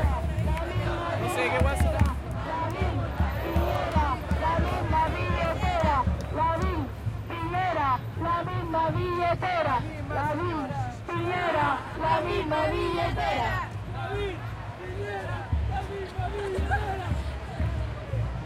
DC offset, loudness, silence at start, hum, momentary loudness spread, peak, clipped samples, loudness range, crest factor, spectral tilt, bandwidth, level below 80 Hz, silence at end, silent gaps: under 0.1%; -28 LUFS; 0 s; none; 8 LU; -10 dBFS; under 0.1%; 5 LU; 18 dB; -6.5 dB/octave; 14.5 kHz; -36 dBFS; 0 s; none